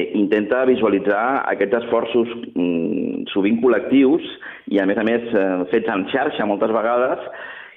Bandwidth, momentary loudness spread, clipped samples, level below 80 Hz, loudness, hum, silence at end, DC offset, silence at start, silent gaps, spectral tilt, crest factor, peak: 4.1 kHz; 7 LU; under 0.1%; -60 dBFS; -19 LUFS; none; 0.05 s; under 0.1%; 0 s; none; -8.5 dB/octave; 14 dB; -6 dBFS